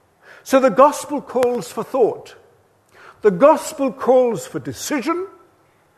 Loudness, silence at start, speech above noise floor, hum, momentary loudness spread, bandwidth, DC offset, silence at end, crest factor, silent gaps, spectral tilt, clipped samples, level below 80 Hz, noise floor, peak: -18 LUFS; 0.45 s; 39 dB; none; 13 LU; 13.5 kHz; under 0.1%; 0.7 s; 18 dB; none; -5 dB/octave; under 0.1%; -62 dBFS; -57 dBFS; 0 dBFS